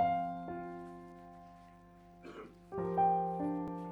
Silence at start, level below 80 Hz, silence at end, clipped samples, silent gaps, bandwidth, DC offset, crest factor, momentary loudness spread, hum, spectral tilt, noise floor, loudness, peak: 0 s; -66 dBFS; 0 s; under 0.1%; none; 7.2 kHz; under 0.1%; 16 dB; 24 LU; none; -9 dB/octave; -58 dBFS; -36 LUFS; -22 dBFS